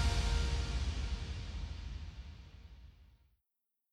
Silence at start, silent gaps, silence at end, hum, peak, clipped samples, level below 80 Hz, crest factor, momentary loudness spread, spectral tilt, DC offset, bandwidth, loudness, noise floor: 0 s; none; 0.9 s; none; -22 dBFS; under 0.1%; -40 dBFS; 16 dB; 21 LU; -4.5 dB/octave; under 0.1%; 12 kHz; -39 LUFS; -87 dBFS